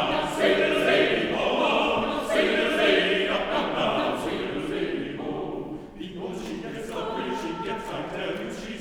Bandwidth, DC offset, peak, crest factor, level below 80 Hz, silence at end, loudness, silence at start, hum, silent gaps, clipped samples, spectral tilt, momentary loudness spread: 17 kHz; under 0.1%; -8 dBFS; 18 dB; -50 dBFS; 0 s; -25 LUFS; 0 s; none; none; under 0.1%; -4.5 dB/octave; 13 LU